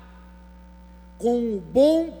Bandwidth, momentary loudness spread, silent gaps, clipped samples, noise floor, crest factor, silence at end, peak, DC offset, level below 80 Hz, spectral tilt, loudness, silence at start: over 20 kHz; 7 LU; none; under 0.1%; -46 dBFS; 16 dB; 0 s; -8 dBFS; under 0.1%; -48 dBFS; -6.5 dB/octave; -22 LUFS; 1.2 s